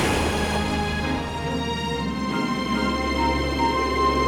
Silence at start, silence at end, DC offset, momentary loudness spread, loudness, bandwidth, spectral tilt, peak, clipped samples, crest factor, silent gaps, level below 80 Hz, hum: 0 s; 0 s; under 0.1%; 4 LU; -24 LUFS; 19 kHz; -5 dB/octave; -8 dBFS; under 0.1%; 14 dB; none; -34 dBFS; none